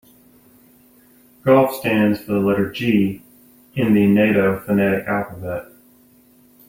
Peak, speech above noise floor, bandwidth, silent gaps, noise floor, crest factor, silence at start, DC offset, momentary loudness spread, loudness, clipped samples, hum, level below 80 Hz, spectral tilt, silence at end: -2 dBFS; 35 dB; 16.5 kHz; none; -52 dBFS; 18 dB; 1.45 s; under 0.1%; 14 LU; -18 LUFS; under 0.1%; none; -54 dBFS; -7.5 dB/octave; 1.05 s